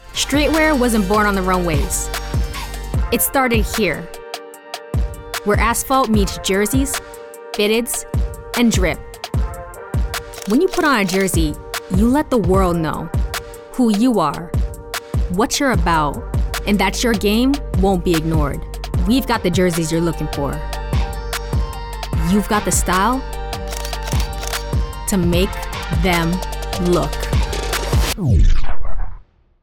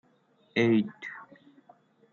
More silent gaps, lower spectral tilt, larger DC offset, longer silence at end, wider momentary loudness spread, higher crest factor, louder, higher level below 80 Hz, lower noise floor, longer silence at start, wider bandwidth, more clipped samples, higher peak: neither; about the same, -5 dB/octave vs -5.5 dB/octave; neither; second, 0.4 s vs 0.9 s; second, 11 LU vs 18 LU; second, 12 dB vs 18 dB; first, -18 LUFS vs -27 LUFS; first, -24 dBFS vs -78 dBFS; second, -38 dBFS vs -66 dBFS; second, 0.05 s vs 0.55 s; first, 20 kHz vs 7 kHz; neither; first, -6 dBFS vs -12 dBFS